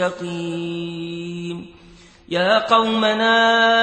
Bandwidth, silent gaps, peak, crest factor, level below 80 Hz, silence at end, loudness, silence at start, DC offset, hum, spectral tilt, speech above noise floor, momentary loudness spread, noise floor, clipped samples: 8.8 kHz; none; 0 dBFS; 18 dB; -56 dBFS; 0 s; -19 LUFS; 0 s; under 0.1%; none; -4.5 dB/octave; 27 dB; 15 LU; -46 dBFS; under 0.1%